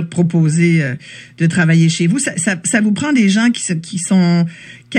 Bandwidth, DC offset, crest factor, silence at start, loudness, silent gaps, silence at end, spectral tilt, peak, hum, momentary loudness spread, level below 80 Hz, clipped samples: 10.5 kHz; under 0.1%; 14 dB; 0 s; -14 LUFS; none; 0 s; -5 dB/octave; 0 dBFS; none; 8 LU; -64 dBFS; under 0.1%